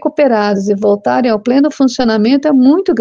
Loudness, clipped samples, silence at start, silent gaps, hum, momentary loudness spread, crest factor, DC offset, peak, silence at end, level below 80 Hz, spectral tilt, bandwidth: -11 LUFS; under 0.1%; 0 s; none; none; 4 LU; 10 dB; under 0.1%; 0 dBFS; 0 s; -48 dBFS; -6 dB/octave; 7.4 kHz